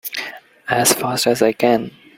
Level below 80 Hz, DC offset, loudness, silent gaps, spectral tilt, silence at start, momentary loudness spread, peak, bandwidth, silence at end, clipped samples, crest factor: -58 dBFS; under 0.1%; -17 LUFS; none; -3 dB/octave; 0.05 s; 14 LU; 0 dBFS; 16.5 kHz; 0.3 s; under 0.1%; 18 dB